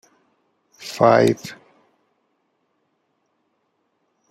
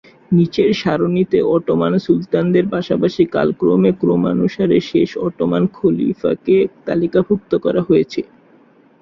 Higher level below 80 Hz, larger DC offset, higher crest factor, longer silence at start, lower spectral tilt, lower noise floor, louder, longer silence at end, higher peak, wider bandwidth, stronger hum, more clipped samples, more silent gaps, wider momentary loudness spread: second, -64 dBFS vs -50 dBFS; neither; first, 22 dB vs 14 dB; first, 0.8 s vs 0.3 s; second, -6 dB/octave vs -8.5 dB/octave; first, -70 dBFS vs -49 dBFS; about the same, -17 LUFS vs -16 LUFS; first, 2.75 s vs 0.8 s; about the same, -2 dBFS vs -2 dBFS; first, 15 kHz vs 7 kHz; neither; neither; neither; first, 23 LU vs 4 LU